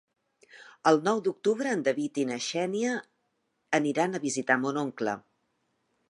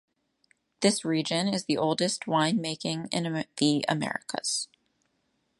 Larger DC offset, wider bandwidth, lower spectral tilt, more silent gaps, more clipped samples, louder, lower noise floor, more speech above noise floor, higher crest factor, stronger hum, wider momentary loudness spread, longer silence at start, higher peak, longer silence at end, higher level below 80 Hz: neither; about the same, 11.5 kHz vs 11.5 kHz; about the same, -4.5 dB/octave vs -4 dB/octave; neither; neither; about the same, -28 LUFS vs -28 LUFS; about the same, -77 dBFS vs -74 dBFS; about the same, 49 dB vs 47 dB; about the same, 22 dB vs 22 dB; neither; about the same, 7 LU vs 6 LU; second, 0.55 s vs 0.8 s; about the same, -8 dBFS vs -8 dBFS; about the same, 0.9 s vs 0.95 s; second, -82 dBFS vs -74 dBFS